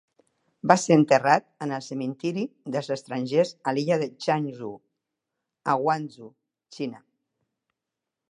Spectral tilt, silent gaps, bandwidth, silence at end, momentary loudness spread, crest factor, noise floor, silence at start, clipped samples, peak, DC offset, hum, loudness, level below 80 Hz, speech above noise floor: -5.5 dB/octave; none; 11 kHz; 1.3 s; 16 LU; 26 dB; -86 dBFS; 0.65 s; under 0.1%; -2 dBFS; under 0.1%; none; -25 LUFS; -74 dBFS; 62 dB